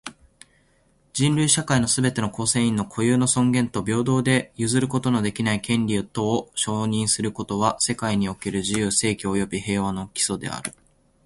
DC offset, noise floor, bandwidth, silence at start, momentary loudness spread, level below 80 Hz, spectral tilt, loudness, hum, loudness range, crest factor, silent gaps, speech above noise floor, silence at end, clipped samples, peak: under 0.1%; -62 dBFS; 11.5 kHz; 0.05 s; 6 LU; -50 dBFS; -4 dB/octave; -22 LUFS; none; 3 LU; 20 dB; none; 39 dB; 0.55 s; under 0.1%; -4 dBFS